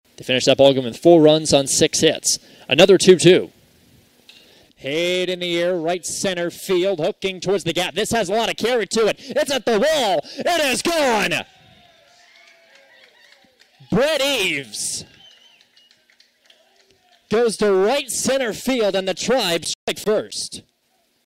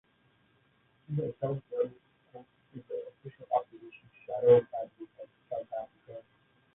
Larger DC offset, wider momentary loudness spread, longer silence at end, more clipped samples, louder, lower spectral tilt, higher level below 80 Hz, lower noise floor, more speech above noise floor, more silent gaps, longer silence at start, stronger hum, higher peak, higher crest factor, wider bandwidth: neither; second, 11 LU vs 27 LU; about the same, 0.65 s vs 0.55 s; neither; first, -18 LUFS vs -32 LUFS; second, -3.5 dB/octave vs -6 dB/octave; first, -54 dBFS vs -74 dBFS; second, -65 dBFS vs -69 dBFS; first, 47 dB vs 37 dB; first, 19.75-19.87 s vs none; second, 0.2 s vs 1.1 s; neither; first, 0 dBFS vs -10 dBFS; about the same, 20 dB vs 24 dB; first, 16 kHz vs 3.8 kHz